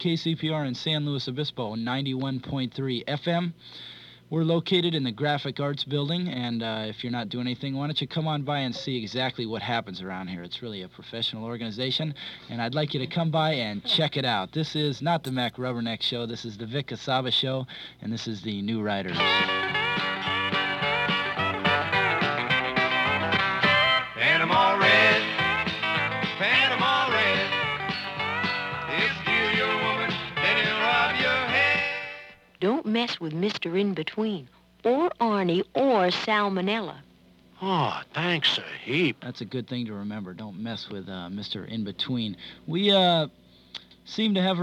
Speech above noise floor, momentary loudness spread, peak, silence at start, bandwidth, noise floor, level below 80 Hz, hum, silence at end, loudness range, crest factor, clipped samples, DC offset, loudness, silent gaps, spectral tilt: 28 dB; 13 LU; -8 dBFS; 0 s; 13 kHz; -56 dBFS; -62 dBFS; none; 0 s; 9 LU; 18 dB; under 0.1%; under 0.1%; -25 LUFS; none; -5.5 dB/octave